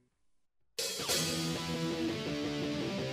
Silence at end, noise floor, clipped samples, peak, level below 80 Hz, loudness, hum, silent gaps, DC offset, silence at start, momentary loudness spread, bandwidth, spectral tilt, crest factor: 0 s; -74 dBFS; under 0.1%; -18 dBFS; -62 dBFS; -34 LUFS; none; none; under 0.1%; 0.8 s; 5 LU; 15.5 kHz; -3.5 dB/octave; 18 dB